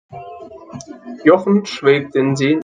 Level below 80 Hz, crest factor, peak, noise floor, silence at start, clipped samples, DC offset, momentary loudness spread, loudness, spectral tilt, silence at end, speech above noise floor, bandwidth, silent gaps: -62 dBFS; 16 dB; 0 dBFS; -35 dBFS; 0.1 s; under 0.1%; under 0.1%; 21 LU; -15 LUFS; -6.5 dB/octave; 0 s; 20 dB; 9.6 kHz; none